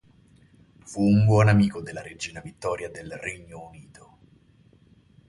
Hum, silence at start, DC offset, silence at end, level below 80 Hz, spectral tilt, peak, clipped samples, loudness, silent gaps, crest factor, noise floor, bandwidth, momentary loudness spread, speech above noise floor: none; 0.9 s; under 0.1%; 1.45 s; -52 dBFS; -7 dB/octave; -8 dBFS; under 0.1%; -24 LUFS; none; 18 dB; -58 dBFS; 11.5 kHz; 22 LU; 34 dB